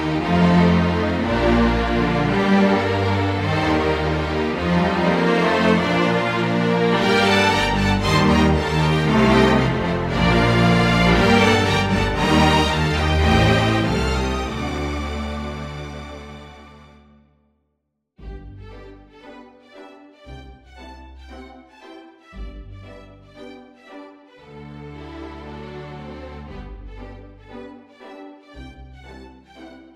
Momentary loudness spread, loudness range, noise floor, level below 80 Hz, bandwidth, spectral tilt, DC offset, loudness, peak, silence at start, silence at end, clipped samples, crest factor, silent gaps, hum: 24 LU; 22 LU; -74 dBFS; -32 dBFS; 14 kHz; -6 dB/octave; under 0.1%; -18 LUFS; -2 dBFS; 0 s; 0.15 s; under 0.1%; 18 dB; none; none